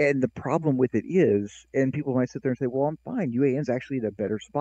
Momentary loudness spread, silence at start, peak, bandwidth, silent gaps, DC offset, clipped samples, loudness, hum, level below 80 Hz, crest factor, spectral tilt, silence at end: 6 LU; 0 s; -10 dBFS; 8.2 kHz; none; under 0.1%; under 0.1%; -26 LUFS; none; -62 dBFS; 16 dB; -8 dB/octave; 0 s